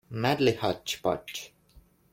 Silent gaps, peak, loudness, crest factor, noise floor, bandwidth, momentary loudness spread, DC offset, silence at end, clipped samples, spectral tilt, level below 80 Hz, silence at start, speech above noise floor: none; -12 dBFS; -28 LUFS; 18 dB; -59 dBFS; 16.5 kHz; 15 LU; under 0.1%; 0.65 s; under 0.1%; -5 dB/octave; -60 dBFS; 0.1 s; 31 dB